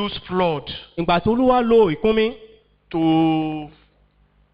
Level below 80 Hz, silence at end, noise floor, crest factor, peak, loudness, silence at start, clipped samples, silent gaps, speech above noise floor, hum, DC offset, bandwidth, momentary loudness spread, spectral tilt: -44 dBFS; 0.85 s; -58 dBFS; 14 dB; -6 dBFS; -19 LUFS; 0 s; under 0.1%; none; 40 dB; 50 Hz at -55 dBFS; under 0.1%; 5.2 kHz; 13 LU; -9 dB/octave